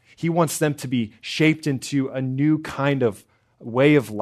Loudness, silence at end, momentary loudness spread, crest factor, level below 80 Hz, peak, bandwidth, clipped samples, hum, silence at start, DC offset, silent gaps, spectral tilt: -22 LUFS; 0 s; 8 LU; 20 dB; -62 dBFS; -2 dBFS; 13.5 kHz; under 0.1%; none; 0.2 s; under 0.1%; none; -6 dB/octave